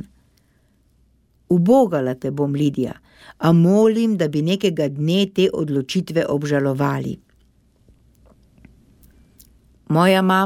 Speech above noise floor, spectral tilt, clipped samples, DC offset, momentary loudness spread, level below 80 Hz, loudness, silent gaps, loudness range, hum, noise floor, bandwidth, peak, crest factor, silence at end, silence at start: 42 dB; -7 dB/octave; under 0.1%; under 0.1%; 9 LU; -56 dBFS; -19 LUFS; none; 8 LU; none; -59 dBFS; 15 kHz; -2 dBFS; 18 dB; 0 s; 1.5 s